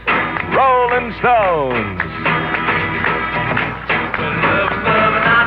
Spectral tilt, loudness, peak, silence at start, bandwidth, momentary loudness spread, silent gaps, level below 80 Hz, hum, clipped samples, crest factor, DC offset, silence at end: -8 dB/octave; -15 LUFS; -2 dBFS; 0 s; 5.8 kHz; 6 LU; none; -38 dBFS; none; under 0.1%; 14 dB; under 0.1%; 0 s